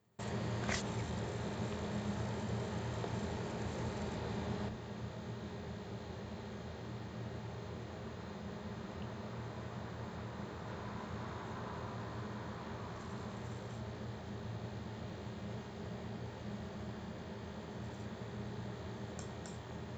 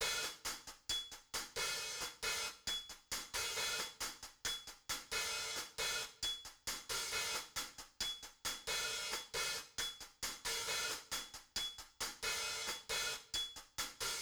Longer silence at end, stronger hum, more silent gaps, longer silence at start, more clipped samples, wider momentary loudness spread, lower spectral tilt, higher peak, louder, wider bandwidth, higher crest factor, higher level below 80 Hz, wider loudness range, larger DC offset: about the same, 0 s vs 0 s; neither; neither; first, 0.2 s vs 0 s; neither; about the same, 6 LU vs 6 LU; first, -6 dB/octave vs 0.5 dB/octave; first, -22 dBFS vs -26 dBFS; second, -44 LUFS vs -41 LUFS; second, 9 kHz vs over 20 kHz; about the same, 20 dB vs 18 dB; first, -58 dBFS vs -64 dBFS; first, 6 LU vs 1 LU; neither